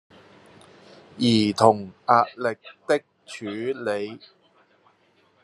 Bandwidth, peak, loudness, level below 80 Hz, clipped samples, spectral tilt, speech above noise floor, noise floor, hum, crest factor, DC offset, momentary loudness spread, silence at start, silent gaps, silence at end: 12.5 kHz; -2 dBFS; -23 LUFS; -66 dBFS; under 0.1%; -5.5 dB/octave; 39 dB; -62 dBFS; none; 24 dB; under 0.1%; 17 LU; 1.15 s; none; 1.25 s